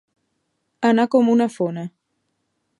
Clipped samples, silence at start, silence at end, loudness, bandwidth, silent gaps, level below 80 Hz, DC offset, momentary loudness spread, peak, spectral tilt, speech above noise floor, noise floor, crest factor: under 0.1%; 0.8 s; 0.9 s; -19 LUFS; 11 kHz; none; -74 dBFS; under 0.1%; 14 LU; -4 dBFS; -6.5 dB/octave; 55 dB; -73 dBFS; 18 dB